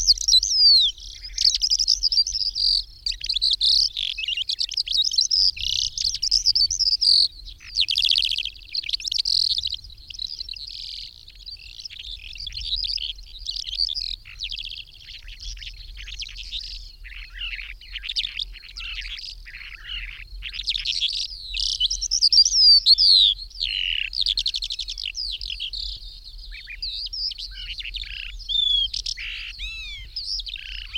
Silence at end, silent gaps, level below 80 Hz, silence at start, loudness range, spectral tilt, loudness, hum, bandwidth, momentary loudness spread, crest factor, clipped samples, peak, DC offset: 0 s; none; -42 dBFS; 0 s; 15 LU; 3 dB/octave; -19 LUFS; none; 16.5 kHz; 21 LU; 18 dB; under 0.1%; -6 dBFS; under 0.1%